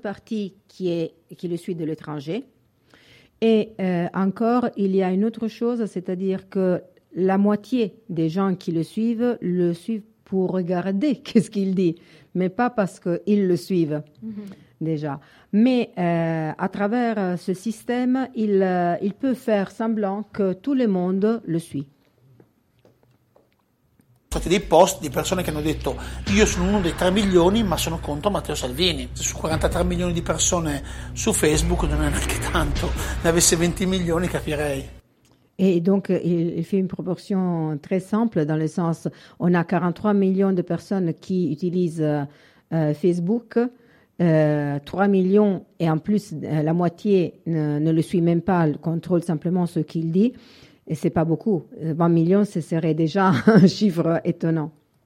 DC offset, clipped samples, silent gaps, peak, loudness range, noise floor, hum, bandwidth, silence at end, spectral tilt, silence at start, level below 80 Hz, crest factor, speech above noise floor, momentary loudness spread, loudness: under 0.1%; under 0.1%; none; -2 dBFS; 4 LU; -65 dBFS; none; 15.5 kHz; 0.35 s; -5.5 dB/octave; 0.05 s; -38 dBFS; 20 dB; 43 dB; 10 LU; -22 LUFS